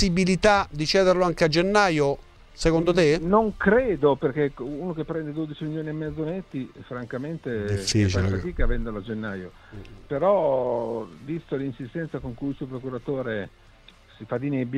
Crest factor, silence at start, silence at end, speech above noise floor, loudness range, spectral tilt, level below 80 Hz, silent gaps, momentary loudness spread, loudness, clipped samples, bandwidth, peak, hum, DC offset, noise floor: 18 dB; 0 s; 0 s; 28 dB; 10 LU; -5.5 dB/octave; -38 dBFS; none; 14 LU; -25 LUFS; under 0.1%; 12.5 kHz; -6 dBFS; none; under 0.1%; -52 dBFS